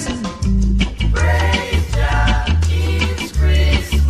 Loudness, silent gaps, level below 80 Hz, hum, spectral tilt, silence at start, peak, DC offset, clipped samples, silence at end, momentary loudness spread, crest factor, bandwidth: -17 LUFS; none; -18 dBFS; none; -5.5 dB/octave; 0 s; -2 dBFS; under 0.1%; under 0.1%; 0 s; 4 LU; 12 dB; 13.5 kHz